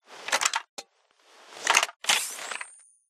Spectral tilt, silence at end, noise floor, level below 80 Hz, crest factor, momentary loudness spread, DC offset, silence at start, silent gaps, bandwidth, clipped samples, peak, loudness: 2.5 dB/octave; 0.35 s; -63 dBFS; -82 dBFS; 28 dB; 19 LU; under 0.1%; 0.1 s; 0.69-0.77 s, 1.96-2.00 s; 15.5 kHz; under 0.1%; -2 dBFS; -26 LUFS